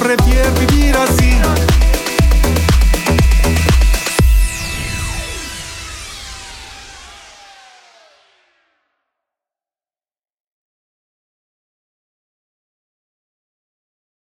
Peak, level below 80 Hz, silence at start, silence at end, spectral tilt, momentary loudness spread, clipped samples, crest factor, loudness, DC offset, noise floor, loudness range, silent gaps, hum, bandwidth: 0 dBFS; -18 dBFS; 0 s; 7.25 s; -5 dB/octave; 18 LU; under 0.1%; 16 dB; -14 LUFS; under 0.1%; under -90 dBFS; 20 LU; none; none; 17 kHz